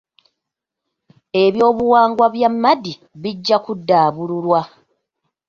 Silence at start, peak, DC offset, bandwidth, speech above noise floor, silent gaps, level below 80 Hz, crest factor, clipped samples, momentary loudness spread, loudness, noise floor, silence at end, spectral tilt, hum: 1.35 s; -2 dBFS; under 0.1%; 7.2 kHz; 66 dB; none; -58 dBFS; 16 dB; under 0.1%; 12 LU; -16 LUFS; -82 dBFS; 0.8 s; -6.5 dB/octave; none